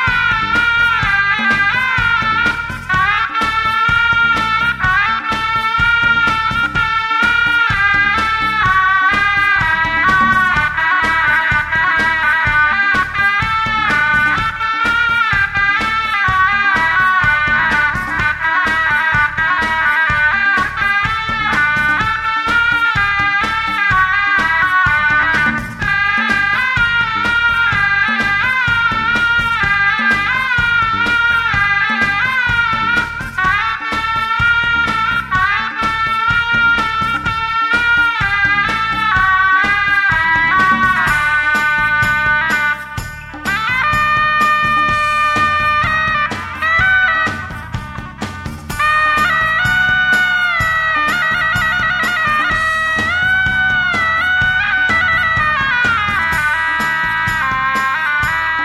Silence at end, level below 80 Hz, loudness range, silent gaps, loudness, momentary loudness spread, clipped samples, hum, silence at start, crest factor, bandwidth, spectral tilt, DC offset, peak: 0 s; -34 dBFS; 2 LU; none; -13 LUFS; 4 LU; under 0.1%; none; 0 s; 12 dB; 15 kHz; -3.5 dB/octave; under 0.1%; -2 dBFS